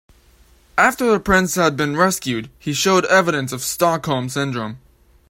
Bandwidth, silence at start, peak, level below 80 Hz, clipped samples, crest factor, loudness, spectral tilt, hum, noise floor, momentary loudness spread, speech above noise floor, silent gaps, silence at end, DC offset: 16.5 kHz; 0.75 s; 0 dBFS; -46 dBFS; under 0.1%; 18 dB; -18 LUFS; -4 dB/octave; none; -52 dBFS; 10 LU; 34 dB; none; 0.55 s; under 0.1%